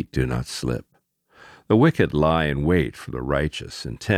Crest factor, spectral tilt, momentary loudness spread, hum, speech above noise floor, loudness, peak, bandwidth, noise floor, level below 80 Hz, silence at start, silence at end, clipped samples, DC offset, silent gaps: 18 dB; -6.5 dB/octave; 14 LU; none; 38 dB; -22 LUFS; -4 dBFS; 14.5 kHz; -59 dBFS; -38 dBFS; 0 s; 0 s; under 0.1%; under 0.1%; none